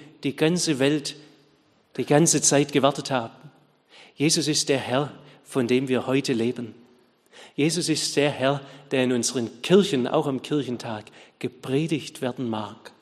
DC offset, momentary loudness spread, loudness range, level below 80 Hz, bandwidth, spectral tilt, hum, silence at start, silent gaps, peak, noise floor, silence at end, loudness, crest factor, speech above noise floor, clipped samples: under 0.1%; 15 LU; 3 LU; -68 dBFS; 13 kHz; -4 dB/octave; none; 0 s; none; -4 dBFS; -61 dBFS; 0.15 s; -24 LUFS; 20 dB; 38 dB; under 0.1%